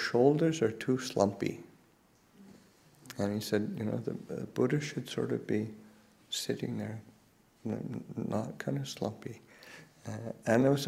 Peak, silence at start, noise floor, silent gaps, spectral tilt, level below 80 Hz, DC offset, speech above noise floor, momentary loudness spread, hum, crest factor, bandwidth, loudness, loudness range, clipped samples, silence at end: -12 dBFS; 0 s; -65 dBFS; none; -6 dB/octave; -70 dBFS; under 0.1%; 33 dB; 19 LU; none; 22 dB; 16 kHz; -34 LUFS; 5 LU; under 0.1%; 0 s